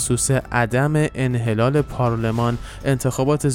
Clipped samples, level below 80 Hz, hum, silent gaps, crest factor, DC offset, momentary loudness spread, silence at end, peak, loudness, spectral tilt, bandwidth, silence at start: under 0.1%; -38 dBFS; none; none; 16 dB; under 0.1%; 4 LU; 0 s; -4 dBFS; -20 LUFS; -5.5 dB/octave; 17 kHz; 0 s